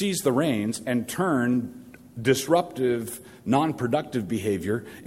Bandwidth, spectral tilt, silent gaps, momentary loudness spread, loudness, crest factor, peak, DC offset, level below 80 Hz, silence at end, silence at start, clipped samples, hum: 16 kHz; -5.5 dB/octave; none; 7 LU; -25 LUFS; 18 dB; -8 dBFS; under 0.1%; -60 dBFS; 0 s; 0 s; under 0.1%; none